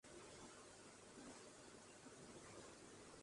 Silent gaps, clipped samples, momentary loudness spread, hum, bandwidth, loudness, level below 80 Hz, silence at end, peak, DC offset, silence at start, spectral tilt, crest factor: none; under 0.1%; 2 LU; none; 11.5 kHz; -60 LUFS; -80 dBFS; 0 s; -46 dBFS; under 0.1%; 0.05 s; -3 dB/octave; 16 dB